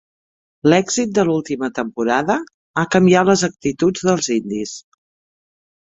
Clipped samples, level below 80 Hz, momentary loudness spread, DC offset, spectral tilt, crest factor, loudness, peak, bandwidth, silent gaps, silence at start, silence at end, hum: under 0.1%; -56 dBFS; 11 LU; under 0.1%; -5 dB/octave; 18 dB; -18 LUFS; -2 dBFS; 8.2 kHz; 2.54-2.74 s; 0.65 s; 1.1 s; none